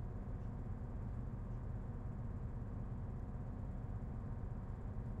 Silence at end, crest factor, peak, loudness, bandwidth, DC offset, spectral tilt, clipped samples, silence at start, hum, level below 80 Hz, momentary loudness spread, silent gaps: 0 s; 12 dB; -32 dBFS; -47 LUFS; 7.2 kHz; under 0.1%; -10.5 dB/octave; under 0.1%; 0 s; none; -48 dBFS; 1 LU; none